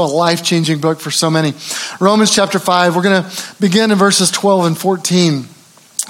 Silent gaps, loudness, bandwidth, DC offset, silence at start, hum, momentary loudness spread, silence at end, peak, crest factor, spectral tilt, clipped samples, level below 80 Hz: none; -13 LUFS; 17 kHz; under 0.1%; 0 s; none; 7 LU; 0 s; 0 dBFS; 14 dB; -4 dB/octave; under 0.1%; -62 dBFS